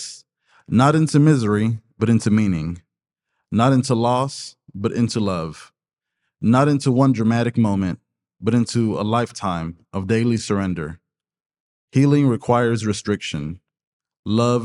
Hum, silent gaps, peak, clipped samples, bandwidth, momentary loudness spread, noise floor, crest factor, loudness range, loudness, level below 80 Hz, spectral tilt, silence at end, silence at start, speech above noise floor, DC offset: none; 11.46-11.50 s, 11.60-11.88 s, 13.87-14.00 s, 14.19-14.23 s; 0 dBFS; under 0.1%; 11.5 kHz; 13 LU; -83 dBFS; 20 dB; 3 LU; -20 LUFS; -54 dBFS; -6.5 dB/octave; 0 s; 0 s; 64 dB; under 0.1%